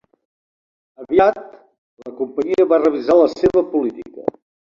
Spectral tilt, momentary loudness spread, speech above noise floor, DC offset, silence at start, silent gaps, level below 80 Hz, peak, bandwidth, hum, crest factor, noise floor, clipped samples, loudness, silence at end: -7 dB/octave; 13 LU; over 74 dB; under 0.1%; 1 s; 1.78-1.97 s; -52 dBFS; 0 dBFS; 7.2 kHz; none; 18 dB; under -90 dBFS; under 0.1%; -17 LUFS; 0.45 s